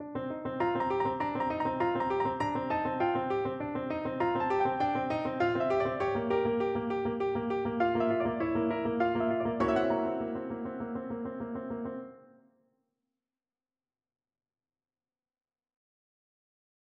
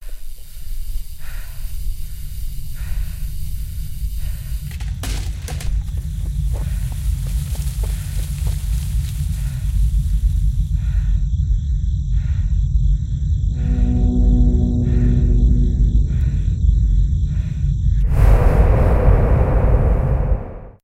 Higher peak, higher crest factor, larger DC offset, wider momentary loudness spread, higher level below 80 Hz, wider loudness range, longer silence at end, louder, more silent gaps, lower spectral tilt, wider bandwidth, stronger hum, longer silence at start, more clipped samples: second, -16 dBFS vs -2 dBFS; about the same, 18 dB vs 16 dB; neither; second, 9 LU vs 16 LU; second, -60 dBFS vs -18 dBFS; about the same, 11 LU vs 12 LU; first, 4.8 s vs 0.1 s; second, -31 LUFS vs -20 LUFS; neither; about the same, -8 dB/octave vs -7.5 dB/octave; second, 8.4 kHz vs 15 kHz; neither; about the same, 0 s vs 0 s; neither